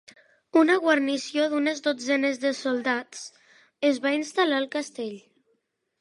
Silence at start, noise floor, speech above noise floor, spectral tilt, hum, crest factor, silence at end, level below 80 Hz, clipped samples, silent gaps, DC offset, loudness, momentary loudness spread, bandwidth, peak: 0.55 s; -73 dBFS; 49 dB; -2.5 dB/octave; none; 18 dB; 0.8 s; -84 dBFS; under 0.1%; none; under 0.1%; -25 LUFS; 15 LU; 11.5 kHz; -8 dBFS